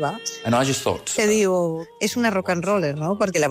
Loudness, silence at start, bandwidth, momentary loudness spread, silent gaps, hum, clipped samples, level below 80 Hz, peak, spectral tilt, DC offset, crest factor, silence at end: -22 LUFS; 0 s; 15.5 kHz; 7 LU; none; none; under 0.1%; -58 dBFS; -10 dBFS; -4 dB/octave; under 0.1%; 12 dB; 0 s